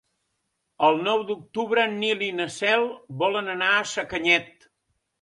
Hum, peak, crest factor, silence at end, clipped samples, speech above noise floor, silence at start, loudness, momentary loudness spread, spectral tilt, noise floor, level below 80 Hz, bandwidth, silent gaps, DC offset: none; -4 dBFS; 20 dB; 0.7 s; under 0.1%; 53 dB; 0.8 s; -23 LUFS; 7 LU; -3.5 dB/octave; -77 dBFS; -64 dBFS; 11.5 kHz; none; under 0.1%